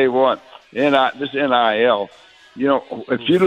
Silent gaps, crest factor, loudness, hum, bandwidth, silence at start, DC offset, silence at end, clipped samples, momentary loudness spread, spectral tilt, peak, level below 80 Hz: none; 18 dB; -18 LUFS; none; 9.4 kHz; 0 s; under 0.1%; 0 s; under 0.1%; 9 LU; -6.5 dB/octave; 0 dBFS; -62 dBFS